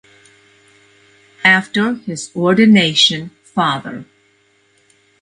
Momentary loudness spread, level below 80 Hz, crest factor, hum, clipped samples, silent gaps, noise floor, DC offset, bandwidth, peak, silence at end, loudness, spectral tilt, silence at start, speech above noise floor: 15 LU; -60 dBFS; 16 dB; none; under 0.1%; none; -57 dBFS; under 0.1%; 10.5 kHz; 0 dBFS; 1.2 s; -14 LUFS; -4 dB/octave; 1.45 s; 42 dB